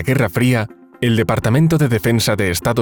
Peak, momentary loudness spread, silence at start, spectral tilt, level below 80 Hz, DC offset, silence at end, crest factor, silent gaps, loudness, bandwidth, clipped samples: -4 dBFS; 5 LU; 0 s; -6 dB/octave; -42 dBFS; under 0.1%; 0 s; 12 dB; none; -16 LUFS; over 20 kHz; under 0.1%